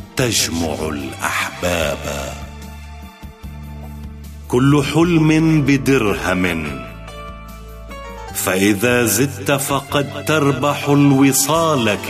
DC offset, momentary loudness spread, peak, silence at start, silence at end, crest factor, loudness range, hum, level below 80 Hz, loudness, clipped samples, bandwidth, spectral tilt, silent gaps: under 0.1%; 21 LU; -4 dBFS; 0 s; 0 s; 14 dB; 8 LU; none; -36 dBFS; -16 LUFS; under 0.1%; 15 kHz; -4.5 dB/octave; none